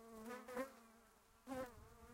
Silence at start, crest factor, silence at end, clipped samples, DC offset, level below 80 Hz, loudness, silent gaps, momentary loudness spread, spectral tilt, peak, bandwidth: 0 s; 18 dB; 0 s; under 0.1%; under 0.1%; -72 dBFS; -52 LUFS; none; 16 LU; -4.5 dB/octave; -36 dBFS; 16 kHz